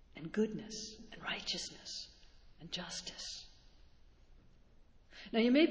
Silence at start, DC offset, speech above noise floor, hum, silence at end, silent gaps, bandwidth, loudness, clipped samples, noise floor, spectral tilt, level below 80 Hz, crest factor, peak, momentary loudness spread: 0.15 s; under 0.1%; 26 dB; none; 0 s; none; 8 kHz; -39 LUFS; under 0.1%; -62 dBFS; -4 dB/octave; -64 dBFS; 22 dB; -18 dBFS; 20 LU